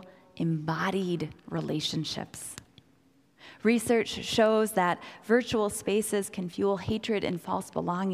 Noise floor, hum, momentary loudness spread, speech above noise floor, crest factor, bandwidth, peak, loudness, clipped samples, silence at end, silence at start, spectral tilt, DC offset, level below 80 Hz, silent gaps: -64 dBFS; none; 10 LU; 35 dB; 18 dB; 16 kHz; -12 dBFS; -29 LUFS; under 0.1%; 0 s; 0 s; -5 dB/octave; under 0.1%; -60 dBFS; none